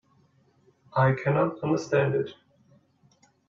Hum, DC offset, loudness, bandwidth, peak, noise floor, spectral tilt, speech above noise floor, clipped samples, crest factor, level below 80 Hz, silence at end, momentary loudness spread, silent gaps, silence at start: none; under 0.1%; -26 LUFS; 7.4 kHz; -10 dBFS; -63 dBFS; -7.5 dB/octave; 39 dB; under 0.1%; 18 dB; -66 dBFS; 1.15 s; 7 LU; none; 0.95 s